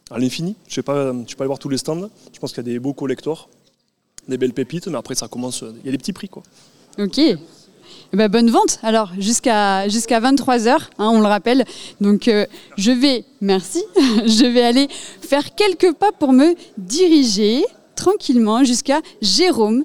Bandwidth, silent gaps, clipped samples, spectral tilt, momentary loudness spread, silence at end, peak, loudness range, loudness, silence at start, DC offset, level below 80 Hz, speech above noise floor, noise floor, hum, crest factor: 16 kHz; none; under 0.1%; -4 dB/octave; 12 LU; 0 s; -2 dBFS; 10 LU; -17 LUFS; 0.1 s; 0.7%; -54 dBFS; 48 dB; -65 dBFS; none; 16 dB